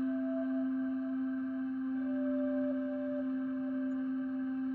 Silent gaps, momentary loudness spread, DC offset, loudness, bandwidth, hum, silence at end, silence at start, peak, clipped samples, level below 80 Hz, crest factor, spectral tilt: none; 3 LU; under 0.1%; -35 LUFS; 3.2 kHz; none; 0 s; 0 s; -26 dBFS; under 0.1%; -74 dBFS; 10 dB; -6 dB/octave